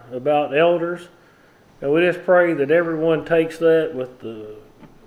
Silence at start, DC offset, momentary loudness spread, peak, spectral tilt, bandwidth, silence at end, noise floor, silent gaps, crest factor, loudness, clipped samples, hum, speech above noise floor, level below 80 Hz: 0.1 s; under 0.1%; 17 LU; -4 dBFS; -7 dB/octave; 10.5 kHz; 0.2 s; -52 dBFS; none; 16 dB; -19 LUFS; under 0.1%; none; 33 dB; -56 dBFS